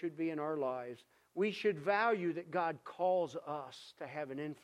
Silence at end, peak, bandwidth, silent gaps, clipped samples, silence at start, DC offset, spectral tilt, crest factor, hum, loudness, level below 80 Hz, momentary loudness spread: 0.1 s; -18 dBFS; 12.5 kHz; none; under 0.1%; 0 s; under 0.1%; -6.5 dB/octave; 18 dB; none; -37 LUFS; -86 dBFS; 15 LU